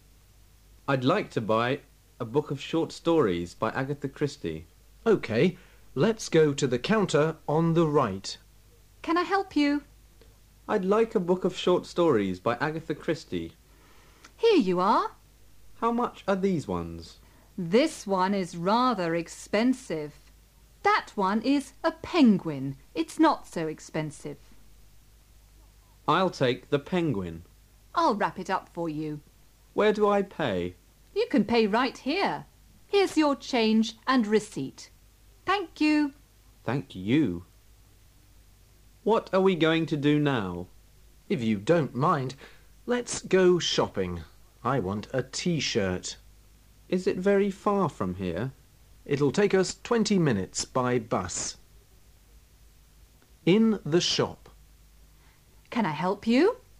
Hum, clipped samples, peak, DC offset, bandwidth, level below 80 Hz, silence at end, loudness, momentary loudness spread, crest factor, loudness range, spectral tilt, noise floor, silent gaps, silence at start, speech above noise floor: none; under 0.1%; -10 dBFS; under 0.1%; 15.5 kHz; -56 dBFS; 0.25 s; -27 LUFS; 12 LU; 18 dB; 4 LU; -5.5 dB/octave; -57 dBFS; none; 0.9 s; 31 dB